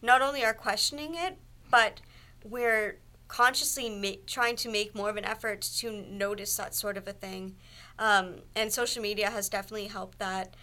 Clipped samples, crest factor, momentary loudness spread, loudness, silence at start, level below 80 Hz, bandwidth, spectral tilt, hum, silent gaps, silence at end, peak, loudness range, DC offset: under 0.1%; 22 dB; 14 LU; -29 LUFS; 0 s; -56 dBFS; 17.5 kHz; -1.5 dB/octave; none; none; 0 s; -8 dBFS; 3 LU; under 0.1%